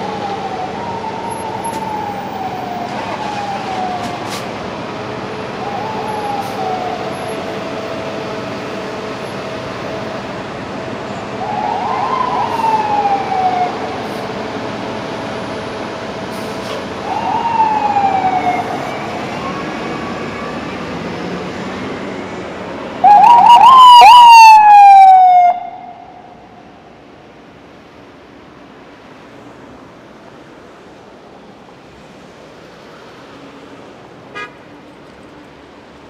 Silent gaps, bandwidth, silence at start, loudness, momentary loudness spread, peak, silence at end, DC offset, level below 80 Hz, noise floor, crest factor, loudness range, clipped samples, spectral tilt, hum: none; 16 kHz; 0 s; -12 LUFS; 21 LU; 0 dBFS; 0 s; under 0.1%; -50 dBFS; -39 dBFS; 14 dB; 19 LU; 1%; -4 dB/octave; none